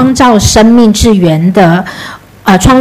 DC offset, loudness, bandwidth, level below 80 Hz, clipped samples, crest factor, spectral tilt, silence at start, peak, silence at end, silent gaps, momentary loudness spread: under 0.1%; -6 LUFS; 15.5 kHz; -22 dBFS; 5%; 6 dB; -5 dB/octave; 0 s; 0 dBFS; 0 s; none; 14 LU